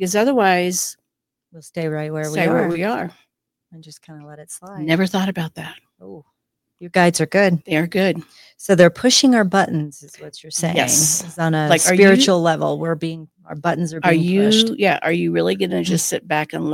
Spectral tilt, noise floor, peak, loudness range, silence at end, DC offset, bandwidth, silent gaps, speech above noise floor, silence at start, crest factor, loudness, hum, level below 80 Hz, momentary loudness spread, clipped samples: -4 dB/octave; -81 dBFS; 0 dBFS; 8 LU; 0 s; under 0.1%; 16.5 kHz; none; 63 dB; 0 s; 18 dB; -17 LUFS; none; -60 dBFS; 17 LU; under 0.1%